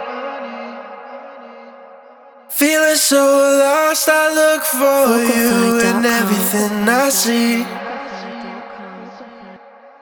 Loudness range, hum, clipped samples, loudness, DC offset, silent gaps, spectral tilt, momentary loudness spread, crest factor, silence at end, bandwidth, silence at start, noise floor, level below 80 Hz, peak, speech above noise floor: 6 LU; none; under 0.1%; -14 LUFS; under 0.1%; none; -3 dB/octave; 21 LU; 16 dB; 0.45 s; over 20 kHz; 0 s; -43 dBFS; -60 dBFS; 0 dBFS; 29 dB